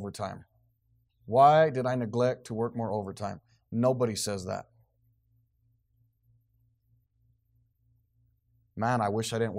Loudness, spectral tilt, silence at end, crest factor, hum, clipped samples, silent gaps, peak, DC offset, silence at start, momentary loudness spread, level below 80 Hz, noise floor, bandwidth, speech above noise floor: -28 LUFS; -5.5 dB/octave; 0 s; 22 dB; none; under 0.1%; none; -10 dBFS; under 0.1%; 0 s; 18 LU; -70 dBFS; -71 dBFS; 15.5 kHz; 44 dB